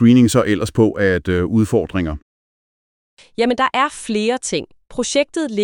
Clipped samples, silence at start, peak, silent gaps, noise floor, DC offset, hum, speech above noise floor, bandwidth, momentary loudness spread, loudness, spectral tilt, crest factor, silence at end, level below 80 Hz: under 0.1%; 0 s; -2 dBFS; 2.22-3.17 s; under -90 dBFS; under 0.1%; none; over 73 dB; 18 kHz; 10 LU; -17 LUFS; -5.5 dB/octave; 16 dB; 0 s; -42 dBFS